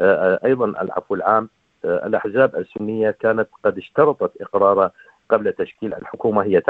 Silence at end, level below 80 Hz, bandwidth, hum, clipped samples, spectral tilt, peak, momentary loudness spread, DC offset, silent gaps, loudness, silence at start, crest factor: 0.1 s; -62 dBFS; 4.4 kHz; none; under 0.1%; -9 dB/octave; -2 dBFS; 9 LU; under 0.1%; none; -20 LUFS; 0 s; 18 dB